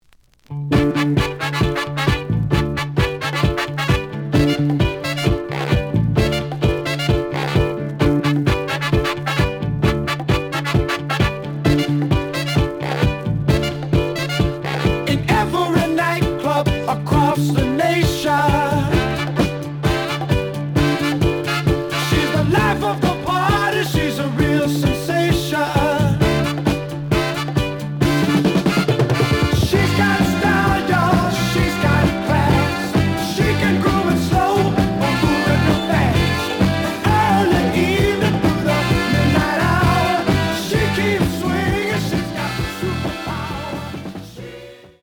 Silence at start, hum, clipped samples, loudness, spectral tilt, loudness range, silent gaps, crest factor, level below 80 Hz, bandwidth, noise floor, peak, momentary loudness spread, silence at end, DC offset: 0.5 s; none; under 0.1%; -18 LUFS; -6 dB/octave; 3 LU; none; 16 dB; -32 dBFS; 20 kHz; -52 dBFS; -2 dBFS; 5 LU; 0.15 s; under 0.1%